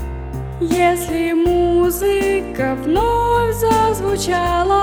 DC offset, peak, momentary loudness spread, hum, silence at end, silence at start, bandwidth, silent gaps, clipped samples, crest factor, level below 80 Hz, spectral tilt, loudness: under 0.1%; -4 dBFS; 6 LU; none; 0 s; 0 s; over 20 kHz; none; under 0.1%; 12 dB; -30 dBFS; -5.5 dB/octave; -17 LUFS